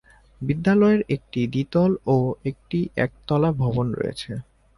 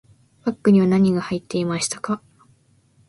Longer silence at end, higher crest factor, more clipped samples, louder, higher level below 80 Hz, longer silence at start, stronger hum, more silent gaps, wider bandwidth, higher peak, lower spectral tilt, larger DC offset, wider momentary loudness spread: second, 0.35 s vs 0.9 s; about the same, 16 dB vs 16 dB; neither; about the same, -23 LUFS vs -21 LUFS; first, -48 dBFS vs -60 dBFS; about the same, 0.4 s vs 0.45 s; neither; neither; about the same, 11.5 kHz vs 11.5 kHz; about the same, -8 dBFS vs -6 dBFS; first, -8.5 dB/octave vs -6 dB/octave; neither; about the same, 12 LU vs 12 LU